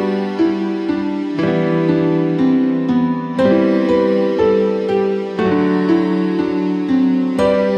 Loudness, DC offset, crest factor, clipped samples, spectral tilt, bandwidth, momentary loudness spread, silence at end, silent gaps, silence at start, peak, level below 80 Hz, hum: -16 LUFS; under 0.1%; 12 dB; under 0.1%; -8.5 dB/octave; 8.8 kHz; 5 LU; 0 s; none; 0 s; -2 dBFS; -50 dBFS; none